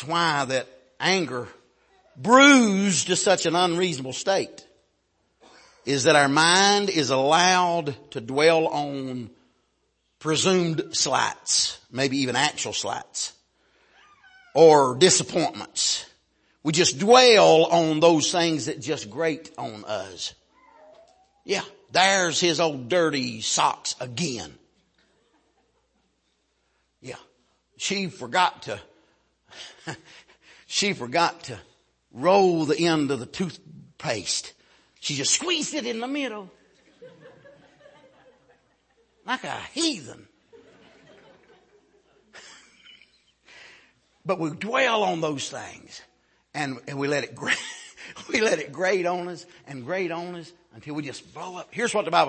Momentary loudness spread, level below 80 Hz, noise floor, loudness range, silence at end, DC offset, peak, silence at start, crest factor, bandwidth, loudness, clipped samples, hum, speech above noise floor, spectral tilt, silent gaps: 20 LU; -68 dBFS; -71 dBFS; 14 LU; 0 s; under 0.1%; -2 dBFS; 0 s; 22 dB; 8.8 kHz; -22 LUFS; under 0.1%; none; 48 dB; -3 dB/octave; none